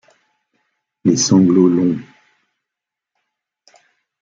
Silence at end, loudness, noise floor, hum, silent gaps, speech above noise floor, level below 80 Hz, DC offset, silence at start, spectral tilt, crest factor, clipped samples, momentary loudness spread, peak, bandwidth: 2.2 s; -14 LUFS; -84 dBFS; none; none; 71 dB; -60 dBFS; under 0.1%; 1.05 s; -5.5 dB/octave; 18 dB; under 0.1%; 9 LU; 0 dBFS; 7.6 kHz